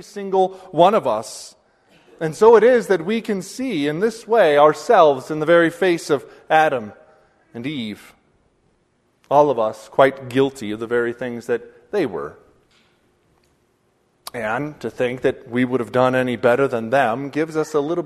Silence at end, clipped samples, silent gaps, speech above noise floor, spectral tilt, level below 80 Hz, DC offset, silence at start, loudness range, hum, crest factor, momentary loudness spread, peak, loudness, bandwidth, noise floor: 0 s; under 0.1%; none; 45 dB; -5.5 dB/octave; -60 dBFS; under 0.1%; 0.15 s; 11 LU; none; 20 dB; 15 LU; 0 dBFS; -19 LUFS; 13.5 kHz; -64 dBFS